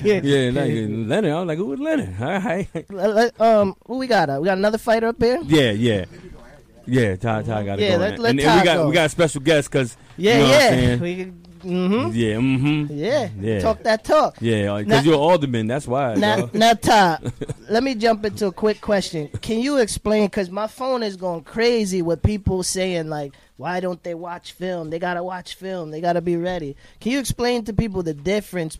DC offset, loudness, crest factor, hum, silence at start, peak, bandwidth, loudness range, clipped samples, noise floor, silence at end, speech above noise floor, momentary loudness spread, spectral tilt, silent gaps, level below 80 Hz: under 0.1%; -20 LUFS; 12 dB; none; 0 s; -6 dBFS; 15.5 kHz; 7 LU; under 0.1%; -45 dBFS; 0 s; 25 dB; 12 LU; -5.5 dB/octave; none; -42 dBFS